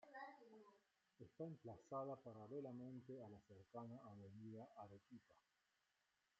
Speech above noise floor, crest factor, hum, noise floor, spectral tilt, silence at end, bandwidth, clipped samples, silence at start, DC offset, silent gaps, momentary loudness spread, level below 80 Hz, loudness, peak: 31 dB; 20 dB; none; -88 dBFS; -7.5 dB/octave; 1 s; 7.4 kHz; under 0.1%; 0 s; under 0.1%; none; 15 LU; under -90 dBFS; -57 LUFS; -40 dBFS